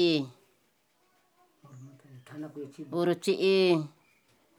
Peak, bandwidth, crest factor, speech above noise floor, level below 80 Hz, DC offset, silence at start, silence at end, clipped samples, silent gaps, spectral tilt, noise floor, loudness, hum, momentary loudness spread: -14 dBFS; 13.5 kHz; 18 dB; 43 dB; under -90 dBFS; under 0.1%; 0 s; 0.7 s; under 0.1%; none; -6 dB/octave; -71 dBFS; -27 LUFS; none; 27 LU